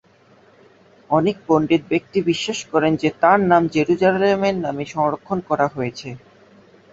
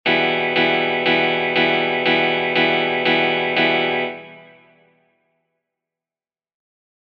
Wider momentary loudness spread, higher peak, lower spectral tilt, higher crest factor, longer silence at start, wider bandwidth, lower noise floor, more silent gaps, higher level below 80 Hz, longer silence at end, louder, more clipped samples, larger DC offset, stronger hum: first, 10 LU vs 2 LU; first, -2 dBFS vs -6 dBFS; about the same, -6 dB/octave vs -6 dB/octave; about the same, 18 dB vs 16 dB; first, 1.1 s vs 0.05 s; first, 8 kHz vs 6.6 kHz; second, -53 dBFS vs under -90 dBFS; neither; first, -56 dBFS vs -62 dBFS; second, 0.75 s vs 2.65 s; about the same, -19 LUFS vs -17 LUFS; neither; neither; neither